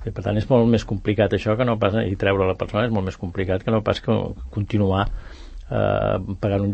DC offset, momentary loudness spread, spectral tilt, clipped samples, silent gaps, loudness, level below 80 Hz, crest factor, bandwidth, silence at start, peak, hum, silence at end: under 0.1%; 9 LU; -8 dB/octave; under 0.1%; none; -22 LUFS; -38 dBFS; 16 dB; 8.2 kHz; 0 s; -4 dBFS; none; 0 s